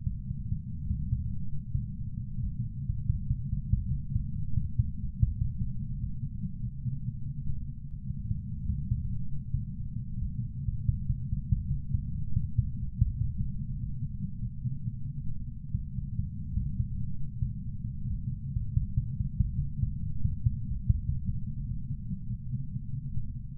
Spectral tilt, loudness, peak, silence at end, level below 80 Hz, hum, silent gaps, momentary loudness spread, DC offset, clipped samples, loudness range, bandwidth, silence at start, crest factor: -18 dB/octave; -35 LUFS; -10 dBFS; 0 s; -36 dBFS; none; none; 6 LU; under 0.1%; under 0.1%; 4 LU; 0.4 kHz; 0 s; 20 dB